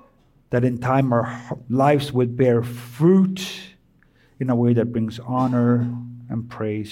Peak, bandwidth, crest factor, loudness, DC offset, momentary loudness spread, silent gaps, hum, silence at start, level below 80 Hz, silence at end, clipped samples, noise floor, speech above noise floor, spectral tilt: -6 dBFS; 16 kHz; 14 dB; -21 LUFS; under 0.1%; 13 LU; none; none; 0.5 s; -58 dBFS; 0 s; under 0.1%; -57 dBFS; 37 dB; -8 dB/octave